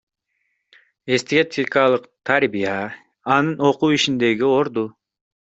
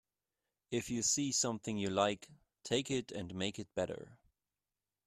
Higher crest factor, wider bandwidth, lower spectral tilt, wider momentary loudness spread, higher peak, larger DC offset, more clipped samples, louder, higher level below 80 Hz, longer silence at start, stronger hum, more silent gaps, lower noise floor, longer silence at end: about the same, 18 dB vs 22 dB; second, 8.2 kHz vs 14 kHz; first, -5 dB/octave vs -3 dB/octave; about the same, 10 LU vs 11 LU; first, -2 dBFS vs -16 dBFS; neither; neither; first, -19 LUFS vs -36 LUFS; first, -62 dBFS vs -70 dBFS; first, 1.05 s vs 0.7 s; neither; neither; second, -72 dBFS vs under -90 dBFS; second, 0.5 s vs 0.9 s